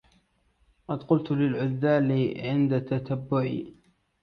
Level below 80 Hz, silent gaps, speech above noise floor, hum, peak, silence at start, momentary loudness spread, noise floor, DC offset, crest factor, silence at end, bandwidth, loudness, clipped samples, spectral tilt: -62 dBFS; none; 42 dB; none; -8 dBFS; 0.9 s; 12 LU; -68 dBFS; under 0.1%; 18 dB; 0.5 s; 5.2 kHz; -27 LUFS; under 0.1%; -10 dB/octave